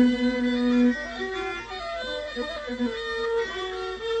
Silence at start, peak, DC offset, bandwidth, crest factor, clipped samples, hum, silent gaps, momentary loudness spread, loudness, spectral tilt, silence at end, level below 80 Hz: 0 s; -10 dBFS; under 0.1%; 8.6 kHz; 16 dB; under 0.1%; none; none; 10 LU; -27 LUFS; -4.5 dB/octave; 0 s; -50 dBFS